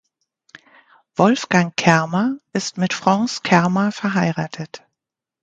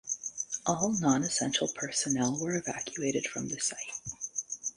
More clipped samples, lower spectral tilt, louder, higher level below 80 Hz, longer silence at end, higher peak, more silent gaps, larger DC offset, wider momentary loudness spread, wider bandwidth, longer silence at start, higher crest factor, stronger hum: neither; first, -5.5 dB/octave vs -3 dB/octave; first, -19 LUFS vs -31 LUFS; first, -60 dBFS vs -66 dBFS; first, 0.65 s vs 0.05 s; first, 0 dBFS vs -14 dBFS; neither; neither; first, 11 LU vs 8 LU; second, 9 kHz vs 11.5 kHz; first, 1.2 s vs 0.05 s; about the same, 20 dB vs 20 dB; neither